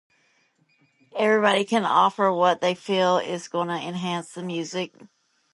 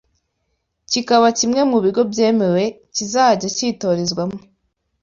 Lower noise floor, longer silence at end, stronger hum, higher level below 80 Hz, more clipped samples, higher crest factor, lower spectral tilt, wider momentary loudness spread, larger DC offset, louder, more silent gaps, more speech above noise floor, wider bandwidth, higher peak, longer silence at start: second, -65 dBFS vs -71 dBFS; about the same, 0.65 s vs 0.65 s; neither; second, -76 dBFS vs -58 dBFS; neither; about the same, 20 dB vs 16 dB; about the same, -4.5 dB/octave vs -4 dB/octave; about the same, 11 LU vs 9 LU; neither; second, -23 LUFS vs -17 LUFS; neither; second, 42 dB vs 54 dB; first, 11.5 kHz vs 7.6 kHz; second, -6 dBFS vs -2 dBFS; first, 1.15 s vs 0.9 s